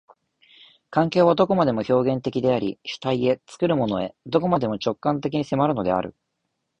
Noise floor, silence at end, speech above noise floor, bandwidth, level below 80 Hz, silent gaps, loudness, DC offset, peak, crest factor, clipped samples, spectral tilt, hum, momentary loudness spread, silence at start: -77 dBFS; 0.7 s; 55 dB; 8.8 kHz; -56 dBFS; none; -23 LUFS; under 0.1%; -4 dBFS; 18 dB; under 0.1%; -7.5 dB/octave; none; 8 LU; 0.9 s